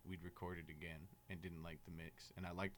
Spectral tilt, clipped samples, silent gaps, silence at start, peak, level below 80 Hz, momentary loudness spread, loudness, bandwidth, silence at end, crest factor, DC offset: -6 dB/octave; under 0.1%; none; 0 s; -32 dBFS; -66 dBFS; 4 LU; -53 LUFS; 19 kHz; 0 s; 20 dB; under 0.1%